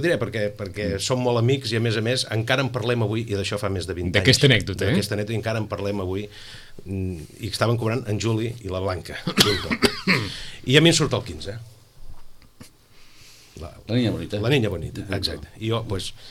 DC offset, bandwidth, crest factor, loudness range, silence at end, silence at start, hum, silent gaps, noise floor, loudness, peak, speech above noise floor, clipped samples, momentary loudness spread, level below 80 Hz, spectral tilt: under 0.1%; 16 kHz; 22 dB; 6 LU; 0 s; 0 s; none; none; -48 dBFS; -23 LUFS; -2 dBFS; 25 dB; under 0.1%; 14 LU; -46 dBFS; -4.5 dB/octave